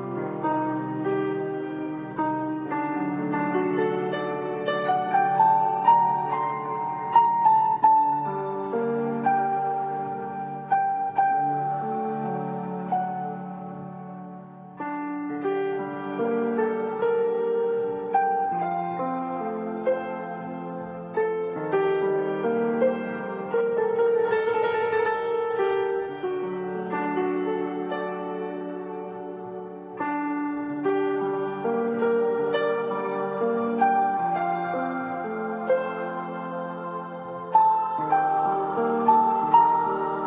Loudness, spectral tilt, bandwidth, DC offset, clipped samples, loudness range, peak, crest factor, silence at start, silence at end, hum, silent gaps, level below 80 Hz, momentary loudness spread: -25 LUFS; -10.5 dB/octave; 4 kHz; under 0.1%; under 0.1%; 7 LU; -6 dBFS; 18 dB; 0 s; 0 s; none; none; -70 dBFS; 13 LU